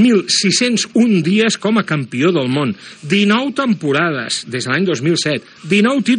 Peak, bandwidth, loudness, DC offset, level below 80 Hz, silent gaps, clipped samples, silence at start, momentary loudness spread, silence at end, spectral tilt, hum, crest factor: -2 dBFS; 10.5 kHz; -15 LUFS; under 0.1%; -68 dBFS; none; under 0.1%; 0 s; 7 LU; 0 s; -4.5 dB/octave; none; 14 dB